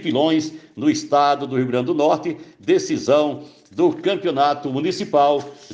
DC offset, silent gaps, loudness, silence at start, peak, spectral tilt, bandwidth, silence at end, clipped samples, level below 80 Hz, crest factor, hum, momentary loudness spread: under 0.1%; none; -20 LUFS; 0 s; -4 dBFS; -5.5 dB/octave; 8.8 kHz; 0 s; under 0.1%; -66 dBFS; 16 dB; none; 7 LU